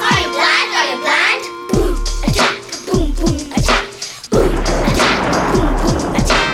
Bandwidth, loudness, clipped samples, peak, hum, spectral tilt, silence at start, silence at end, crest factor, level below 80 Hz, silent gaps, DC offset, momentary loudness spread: 16 kHz; -15 LUFS; under 0.1%; -2 dBFS; none; -4 dB/octave; 0 s; 0 s; 14 dB; -22 dBFS; none; under 0.1%; 7 LU